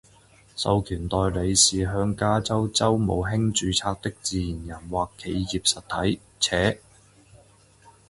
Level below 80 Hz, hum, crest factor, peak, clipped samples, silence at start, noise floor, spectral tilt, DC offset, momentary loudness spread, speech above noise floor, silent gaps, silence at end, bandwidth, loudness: -42 dBFS; none; 20 dB; -6 dBFS; under 0.1%; 0.55 s; -55 dBFS; -4 dB/octave; under 0.1%; 10 LU; 31 dB; none; 0.2 s; 11.5 kHz; -24 LUFS